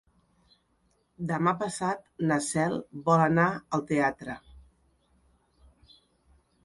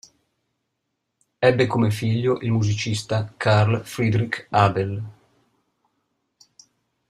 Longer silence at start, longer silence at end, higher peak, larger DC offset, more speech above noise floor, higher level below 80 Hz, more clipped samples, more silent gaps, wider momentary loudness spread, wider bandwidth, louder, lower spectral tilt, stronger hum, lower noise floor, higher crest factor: second, 1.2 s vs 1.4 s; about the same, 2.05 s vs 2 s; second, -10 dBFS vs -2 dBFS; neither; second, 43 dB vs 57 dB; second, -62 dBFS vs -56 dBFS; neither; neither; first, 13 LU vs 8 LU; second, 11.5 kHz vs 13 kHz; second, -28 LUFS vs -21 LUFS; about the same, -6 dB/octave vs -6.5 dB/octave; neither; second, -70 dBFS vs -78 dBFS; about the same, 22 dB vs 20 dB